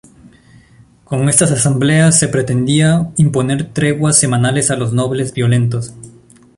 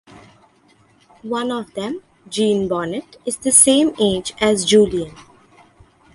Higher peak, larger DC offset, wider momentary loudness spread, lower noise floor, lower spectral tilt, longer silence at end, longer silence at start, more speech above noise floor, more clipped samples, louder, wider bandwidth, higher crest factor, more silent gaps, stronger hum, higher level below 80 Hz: about the same, 0 dBFS vs 0 dBFS; neither; second, 7 LU vs 17 LU; second, -46 dBFS vs -55 dBFS; first, -5 dB/octave vs -3 dB/octave; second, 0.45 s vs 0.9 s; first, 1.1 s vs 0.15 s; second, 33 dB vs 37 dB; neither; first, -13 LUFS vs -17 LUFS; about the same, 11.5 kHz vs 12 kHz; second, 14 dB vs 20 dB; neither; neither; about the same, -46 dBFS vs -50 dBFS